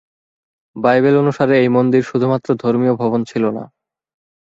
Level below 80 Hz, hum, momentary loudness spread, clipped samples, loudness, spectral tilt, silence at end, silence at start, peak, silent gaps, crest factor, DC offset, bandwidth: -60 dBFS; none; 7 LU; under 0.1%; -15 LUFS; -8 dB/octave; 0.95 s; 0.75 s; -2 dBFS; none; 14 dB; under 0.1%; 7.6 kHz